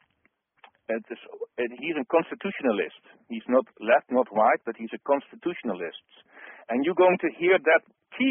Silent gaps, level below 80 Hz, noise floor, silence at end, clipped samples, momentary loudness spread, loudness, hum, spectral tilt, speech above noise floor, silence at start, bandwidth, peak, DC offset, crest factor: none; -74 dBFS; -71 dBFS; 0 s; under 0.1%; 17 LU; -26 LUFS; none; 0 dB/octave; 45 dB; 0.9 s; 3.7 kHz; -6 dBFS; under 0.1%; 20 dB